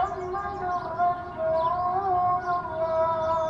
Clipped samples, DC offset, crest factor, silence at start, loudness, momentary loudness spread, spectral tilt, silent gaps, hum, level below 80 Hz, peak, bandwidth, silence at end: under 0.1%; under 0.1%; 12 dB; 0 s; -27 LUFS; 5 LU; -7 dB/octave; none; none; -52 dBFS; -14 dBFS; 7.6 kHz; 0 s